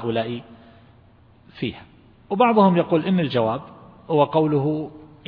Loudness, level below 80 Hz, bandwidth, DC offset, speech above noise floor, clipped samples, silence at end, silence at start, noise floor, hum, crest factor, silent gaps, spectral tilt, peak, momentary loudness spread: -21 LUFS; -58 dBFS; 5.2 kHz; under 0.1%; 32 dB; under 0.1%; 0.25 s; 0 s; -52 dBFS; none; 18 dB; none; -10.5 dB/octave; -4 dBFS; 14 LU